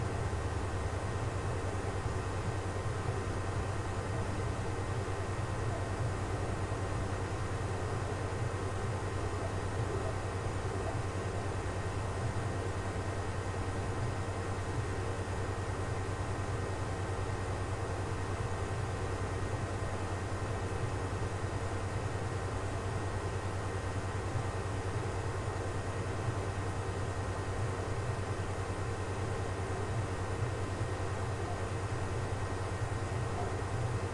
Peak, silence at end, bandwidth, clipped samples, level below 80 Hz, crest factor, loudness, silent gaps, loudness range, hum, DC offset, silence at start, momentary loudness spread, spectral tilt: -22 dBFS; 0 s; 11.5 kHz; under 0.1%; -46 dBFS; 12 dB; -37 LUFS; none; 0 LU; none; under 0.1%; 0 s; 1 LU; -6 dB/octave